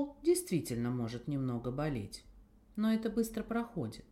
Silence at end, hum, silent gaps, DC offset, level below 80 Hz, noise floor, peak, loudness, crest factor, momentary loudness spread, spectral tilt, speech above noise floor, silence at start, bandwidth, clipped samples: 0.1 s; none; none; under 0.1%; -58 dBFS; -56 dBFS; -20 dBFS; -36 LUFS; 16 dB; 10 LU; -6 dB/octave; 21 dB; 0 s; 16.5 kHz; under 0.1%